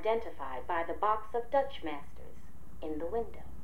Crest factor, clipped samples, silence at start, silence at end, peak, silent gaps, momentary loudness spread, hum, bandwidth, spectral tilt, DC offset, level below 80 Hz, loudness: 20 dB; under 0.1%; 0 s; 0 s; -16 dBFS; none; 22 LU; none; 16 kHz; -6 dB/octave; 2%; -54 dBFS; -36 LUFS